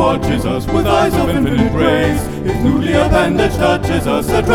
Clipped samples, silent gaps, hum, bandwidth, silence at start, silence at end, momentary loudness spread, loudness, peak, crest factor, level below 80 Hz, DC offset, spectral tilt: under 0.1%; none; none; 18 kHz; 0 s; 0 s; 4 LU; -14 LUFS; 0 dBFS; 14 dB; -26 dBFS; 0.9%; -6.5 dB/octave